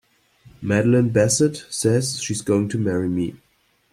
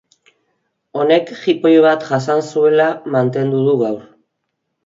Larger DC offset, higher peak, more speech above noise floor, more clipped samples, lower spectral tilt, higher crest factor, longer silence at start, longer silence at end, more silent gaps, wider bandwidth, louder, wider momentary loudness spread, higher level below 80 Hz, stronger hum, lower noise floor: neither; second, -4 dBFS vs 0 dBFS; second, 33 dB vs 59 dB; neither; second, -5 dB/octave vs -7 dB/octave; about the same, 18 dB vs 16 dB; second, 0.6 s vs 0.95 s; second, 0.55 s vs 0.85 s; neither; first, 15.5 kHz vs 7.6 kHz; second, -20 LUFS vs -15 LUFS; about the same, 8 LU vs 8 LU; first, -56 dBFS vs -66 dBFS; neither; second, -52 dBFS vs -73 dBFS